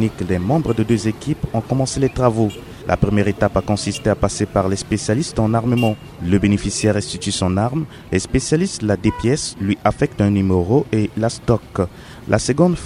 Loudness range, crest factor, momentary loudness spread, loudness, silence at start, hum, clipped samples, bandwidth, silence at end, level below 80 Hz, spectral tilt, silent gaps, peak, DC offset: 1 LU; 18 dB; 6 LU; -19 LUFS; 0 s; none; under 0.1%; 13.5 kHz; 0 s; -36 dBFS; -6 dB/octave; none; 0 dBFS; under 0.1%